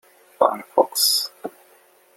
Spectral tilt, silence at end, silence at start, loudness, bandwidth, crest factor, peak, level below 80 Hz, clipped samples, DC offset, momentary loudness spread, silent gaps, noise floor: -0.5 dB/octave; 0.65 s; 0.4 s; -20 LUFS; 16.5 kHz; 22 dB; -2 dBFS; -74 dBFS; under 0.1%; under 0.1%; 18 LU; none; -55 dBFS